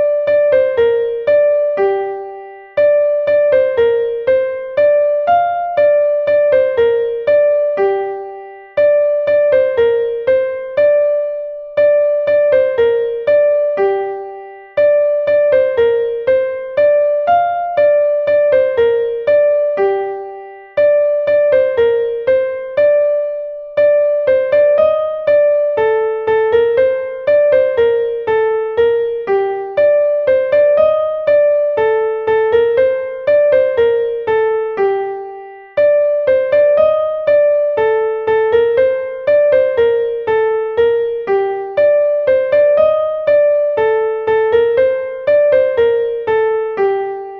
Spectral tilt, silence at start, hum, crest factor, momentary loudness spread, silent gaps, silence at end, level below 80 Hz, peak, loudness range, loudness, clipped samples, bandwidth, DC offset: -7 dB/octave; 0 s; none; 12 dB; 6 LU; none; 0 s; -52 dBFS; -2 dBFS; 1 LU; -14 LUFS; under 0.1%; 4.6 kHz; under 0.1%